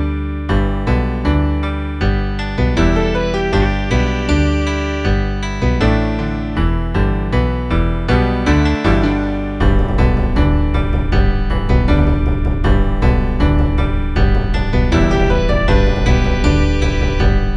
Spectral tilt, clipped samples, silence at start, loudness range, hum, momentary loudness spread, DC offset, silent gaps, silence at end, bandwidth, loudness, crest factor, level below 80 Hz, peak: -7 dB/octave; under 0.1%; 0 s; 2 LU; none; 4 LU; under 0.1%; none; 0 s; 7.6 kHz; -16 LUFS; 14 dB; -16 dBFS; 0 dBFS